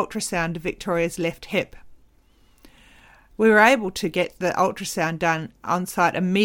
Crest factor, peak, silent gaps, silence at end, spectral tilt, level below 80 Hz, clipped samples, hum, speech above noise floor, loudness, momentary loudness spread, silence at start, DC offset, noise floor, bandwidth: 20 dB; -2 dBFS; none; 0 s; -4.5 dB/octave; -50 dBFS; under 0.1%; none; 35 dB; -22 LUFS; 11 LU; 0 s; under 0.1%; -57 dBFS; 18 kHz